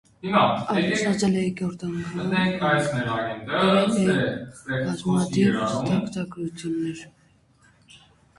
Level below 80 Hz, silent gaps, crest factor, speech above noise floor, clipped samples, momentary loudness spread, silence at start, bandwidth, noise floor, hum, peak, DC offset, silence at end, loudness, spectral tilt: -56 dBFS; none; 18 dB; 35 dB; under 0.1%; 10 LU; 0.25 s; 11.5 kHz; -59 dBFS; none; -6 dBFS; under 0.1%; 0.4 s; -24 LUFS; -5.5 dB/octave